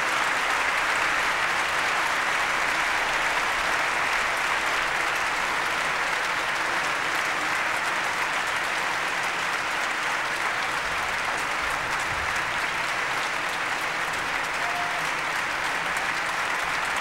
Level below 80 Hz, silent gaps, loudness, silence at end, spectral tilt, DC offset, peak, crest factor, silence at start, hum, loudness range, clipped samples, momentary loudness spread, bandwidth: -52 dBFS; none; -24 LUFS; 0 s; -1 dB/octave; 0.1%; -10 dBFS; 16 dB; 0 s; none; 3 LU; under 0.1%; 3 LU; 16 kHz